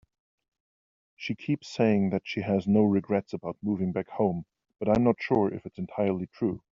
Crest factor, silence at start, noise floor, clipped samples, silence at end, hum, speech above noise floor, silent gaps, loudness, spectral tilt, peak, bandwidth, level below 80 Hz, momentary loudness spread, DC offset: 20 dB; 1.2 s; under -90 dBFS; under 0.1%; 0.25 s; none; over 63 dB; none; -28 LUFS; -7 dB/octave; -8 dBFS; 7.4 kHz; -60 dBFS; 12 LU; under 0.1%